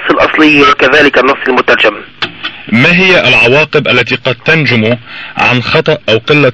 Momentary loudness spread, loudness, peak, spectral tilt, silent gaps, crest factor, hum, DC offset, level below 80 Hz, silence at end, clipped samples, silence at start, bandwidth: 12 LU; -7 LUFS; 0 dBFS; -5.5 dB/octave; none; 8 dB; none; 0.6%; -40 dBFS; 0 s; 0.4%; 0 s; 9 kHz